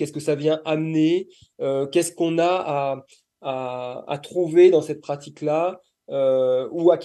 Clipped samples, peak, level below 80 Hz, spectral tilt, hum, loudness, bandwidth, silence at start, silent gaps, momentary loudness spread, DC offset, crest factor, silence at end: under 0.1%; -4 dBFS; -72 dBFS; -6 dB/octave; none; -22 LUFS; 12.5 kHz; 0 s; none; 14 LU; under 0.1%; 18 dB; 0 s